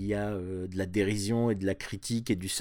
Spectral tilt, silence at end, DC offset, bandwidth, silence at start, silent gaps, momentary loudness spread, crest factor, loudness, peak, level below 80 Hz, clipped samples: -5 dB/octave; 0 s; under 0.1%; 19 kHz; 0 s; none; 7 LU; 14 dB; -31 LUFS; -16 dBFS; -54 dBFS; under 0.1%